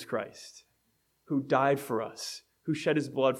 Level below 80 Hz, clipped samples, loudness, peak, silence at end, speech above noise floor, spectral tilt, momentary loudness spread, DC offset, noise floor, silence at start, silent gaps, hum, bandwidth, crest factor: -78 dBFS; under 0.1%; -31 LUFS; -10 dBFS; 0 s; 44 dB; -5.5 dB/octave; 15 LU; under 0.1%; -74 dBFS; 0 s; none; none; 16 kHz; 20 dB